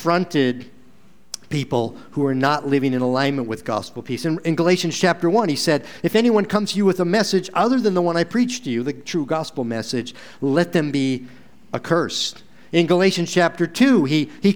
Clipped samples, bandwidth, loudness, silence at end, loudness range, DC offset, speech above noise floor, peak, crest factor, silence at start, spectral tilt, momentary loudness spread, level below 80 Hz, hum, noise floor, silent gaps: under 0.1%; over 20 kHz; -20 LUFS; 0 s; 4 LU; 0.7%; 34 dB; -2 dBFS; 18 dB; 0 s; -5.5 dB/octave; 9 LU; -62 dBFS; none; -53 dBFS; none